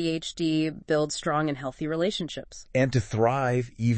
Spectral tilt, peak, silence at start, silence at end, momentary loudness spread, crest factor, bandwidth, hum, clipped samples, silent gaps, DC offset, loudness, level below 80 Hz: -6 dB/octave; -10 dBFS; 0 s; 0 s; 7 LU; 18 dB; 8.8 kHz; none; under 0.1%; none; under 0.1%; -27 LUFS; -54 dBFS